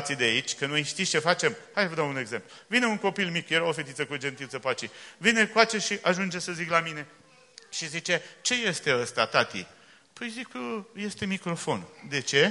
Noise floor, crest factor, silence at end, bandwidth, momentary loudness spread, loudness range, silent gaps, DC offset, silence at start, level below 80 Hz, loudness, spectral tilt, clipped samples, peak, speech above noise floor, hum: -54 dBFS; 26 dB; 0 s; 11.5 kHz; 12 LU; 3 LU; none; under 0.1%; 0 s; -70 dBFS; -27 LUFS; -3 dB/octave; under 0.1%; -4 dBFS; 26 dB; none